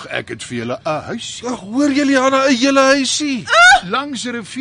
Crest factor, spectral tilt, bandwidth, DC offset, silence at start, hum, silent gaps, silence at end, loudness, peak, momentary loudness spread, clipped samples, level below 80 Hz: 14 dB; -2.5 dB/octave; 10.5 kHz; under 0.1%; 0 s; none; none; 0 s; -14 LUFS; -2 dBFS; 15 LU; under 0.1%; -50 dBFS